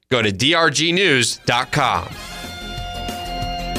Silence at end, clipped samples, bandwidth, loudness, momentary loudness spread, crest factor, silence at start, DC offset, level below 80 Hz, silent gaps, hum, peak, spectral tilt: 0 s; under 0.1%; 15.5 kHz; -17 LUFS; 15 LU; 16 dB; 0.1 s; under 0.1%; -38 dBFS; none; none; -4 dBFS; -3 dB/octave